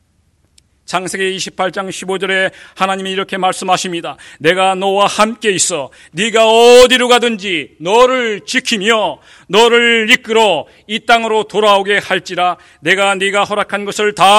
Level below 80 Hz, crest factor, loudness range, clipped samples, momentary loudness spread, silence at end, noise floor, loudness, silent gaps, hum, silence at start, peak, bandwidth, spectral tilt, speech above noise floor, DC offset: -48 dBFS; 12 dB; 6 LU; 0.9%; 12 LU; 0 s; -57 dBFS; -12 LUFS; none; none; 0.9 s; 0 dBFS; 19 kHz; -2.5 dB/octave; 44 dB; under 0.1%